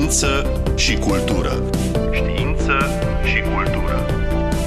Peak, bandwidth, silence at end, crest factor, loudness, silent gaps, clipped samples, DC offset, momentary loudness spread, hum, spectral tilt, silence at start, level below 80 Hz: -6 dBFS; 14 kHz; 0 s; 12 dB; -19 LUFS; none; under 0.1%; under 0.1%; 4 LU; none; -4.5 dB/octave; 0 s; -22 dBFS